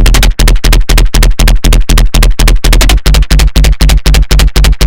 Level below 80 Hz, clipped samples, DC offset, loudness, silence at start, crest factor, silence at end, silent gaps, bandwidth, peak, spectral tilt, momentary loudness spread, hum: -4 dBFS; 10%; 20%; -8 LUFS; 0 s; 6 dB; 0 s; none; 17.5 kHz; 0 dBFS; -4 dB/octave; 2 LU; none